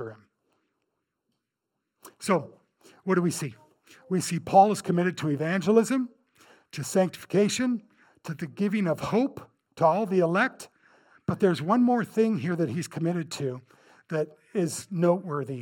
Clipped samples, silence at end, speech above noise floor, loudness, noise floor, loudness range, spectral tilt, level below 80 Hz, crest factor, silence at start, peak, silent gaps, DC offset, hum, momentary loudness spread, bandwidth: under 0.1%; 0 s; 58 dB; -26 LUFS; -83 dBFS; 6 LU; -6 dB/octave; -68 dBFS; 22 dB; 0 s; -6 dBFS; none; under 0.1%; none; 14 LU; 18.5 kHz